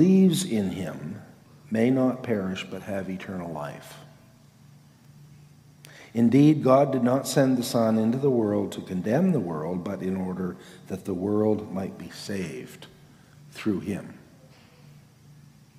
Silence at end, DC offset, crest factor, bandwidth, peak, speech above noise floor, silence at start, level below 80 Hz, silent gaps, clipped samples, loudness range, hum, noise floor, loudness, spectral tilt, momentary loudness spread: 1.6 s; under 0.1%; 18 dB; 15.5 kHz; -8 dBFS; 29 dB; 0 s; -68 dBFS; none; under 0.1%; 14 LU; none; -54 dBFS; -25 LUFS; -6.5 dB/octave; 18 LU